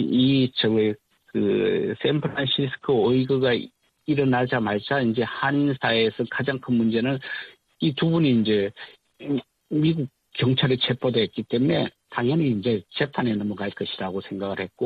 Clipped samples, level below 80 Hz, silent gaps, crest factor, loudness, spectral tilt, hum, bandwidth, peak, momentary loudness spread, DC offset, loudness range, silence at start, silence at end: under 0.1%; -60 dBFS; none; 16 dB; -24 LUFS; -8.5 dB/octave; none; 4.9 kHz; -8 dBFS; 9 LU; under 0.1%; 2 LU; 0 s; 0 s